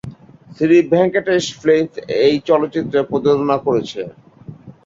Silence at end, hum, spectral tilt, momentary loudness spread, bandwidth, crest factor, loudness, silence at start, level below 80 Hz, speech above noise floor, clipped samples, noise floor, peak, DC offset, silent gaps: 0.15 s; none; -6 dB/octave; 9 LU; 7.8 kHz; 14 dB; -16 LUFS; 0.05 s; -54 dBFS; 22 dB; under 0.1%; -37 dBFS; -2 dBFS; under 0.1%; none